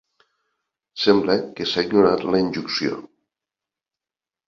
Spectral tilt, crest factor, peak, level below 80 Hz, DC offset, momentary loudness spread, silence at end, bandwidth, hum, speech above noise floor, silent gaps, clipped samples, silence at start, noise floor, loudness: -5.5 dB/octave; 20 dB; -2 dBFS; -58 dBFS; under 0.1%; 9 LU; 1.45 s; 7.2 kHz; none; over 70 dB; none; under 0.1%; 0.95 s; under -90 dBFS; -20 LUFS